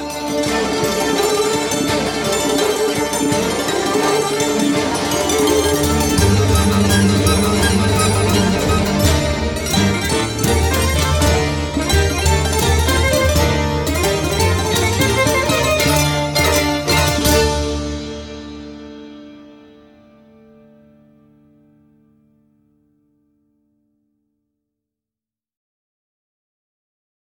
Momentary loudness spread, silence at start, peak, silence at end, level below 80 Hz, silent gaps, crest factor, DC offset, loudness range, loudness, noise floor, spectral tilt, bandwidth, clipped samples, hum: 6 LU; 0 s; -2 dBFS; 7.8 s; -28 dBFS; none; 16 dB; under 0.1%; 4 LU; -16 LUFS; -90 dBFS; -4 dB/octave; 17.5 kHz; under 0.1%; none